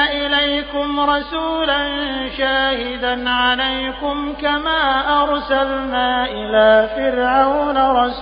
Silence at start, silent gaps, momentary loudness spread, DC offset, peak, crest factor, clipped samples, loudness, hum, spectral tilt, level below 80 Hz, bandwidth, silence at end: 0 s; none; 6 LU; under 0.1%; -2 dBFS; 14 dB; under 0.1%; -17 LUFS; none; 0 dB/octave; -38 dBFS; 5.2 kHz; 0 s